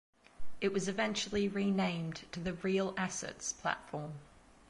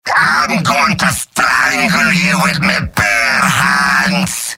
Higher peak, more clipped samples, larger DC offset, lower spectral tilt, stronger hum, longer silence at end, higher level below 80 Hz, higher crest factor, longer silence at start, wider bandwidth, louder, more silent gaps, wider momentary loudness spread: second, -16 dBFS vs 0 dBFS; neither; neither; first, -4.5 dB/octave vs -3 dB/octave; neither; about the same, 0.05 s vs 0 s; second, -62 dBFS vs -40 dBFS; first, 20 dB vs 12 dB; first, 0.4 s vs 0.05 s; second, 11.5 kHz vs 16.5 kHz; second, -36 LUFS vs -11 LUFS; neither; first, 9 LU vs 3 LU